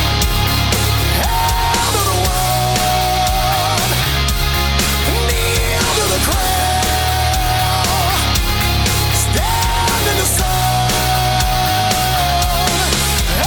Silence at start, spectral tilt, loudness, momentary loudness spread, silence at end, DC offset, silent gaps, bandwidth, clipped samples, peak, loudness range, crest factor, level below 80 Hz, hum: 0 s; -3 dB/octave; -15 LUFS; 1 LU; 0 s; under 0.1%; none; 19.5 kHz; under 0.1%; -2 dBFS; 0 LU; 12 dB; -22 dBFS; none